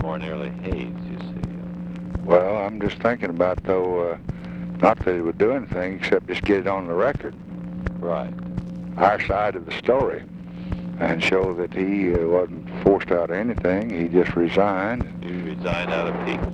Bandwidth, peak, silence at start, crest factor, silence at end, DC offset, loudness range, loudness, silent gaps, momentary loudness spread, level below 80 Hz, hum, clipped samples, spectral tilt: 9 kHz; -2 dBFS; 0 s; 22 dB; 0 s; under 0.1%; 3 LU; -23 LUFS; none; 12 LU; -40 dBFS; none; under 0.1%; -7.5 dB/octave